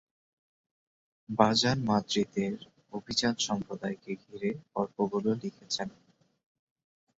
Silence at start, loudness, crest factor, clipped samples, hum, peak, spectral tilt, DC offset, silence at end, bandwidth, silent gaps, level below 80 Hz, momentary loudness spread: 1.3 s; -31 LUFS; 28 dB; under 0.1%; none; -6 dBFS; -4.5 dB/octave; under 0.1%; 1.3 s; 8 kHz; none; -66 dBFS; 14 LU